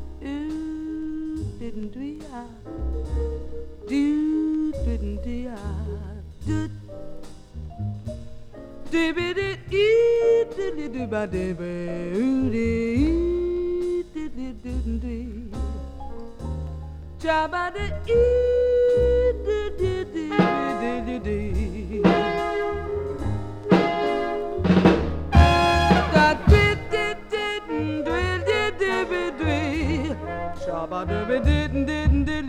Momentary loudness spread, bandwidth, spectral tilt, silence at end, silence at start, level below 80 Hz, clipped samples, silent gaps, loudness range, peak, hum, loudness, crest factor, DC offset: 17 LU; 10.5 kHz; -7 dB/octave; 0 s; 0 s; -32 dBFS; under 0.1%; none; 12 LU; -2 dBFS; none; -24 LUFS; 22 dB; under 0.1%